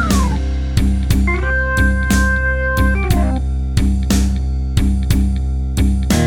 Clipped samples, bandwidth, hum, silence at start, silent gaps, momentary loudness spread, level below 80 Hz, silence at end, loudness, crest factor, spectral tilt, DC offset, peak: under 0.1%; 17.5 kHz; none; 0 s; none; 4 LU; -16 dBFS; 0 s; -17 LUFS; 14 dB; -5.5 dB/octave; under 0.1%; 0 dBFS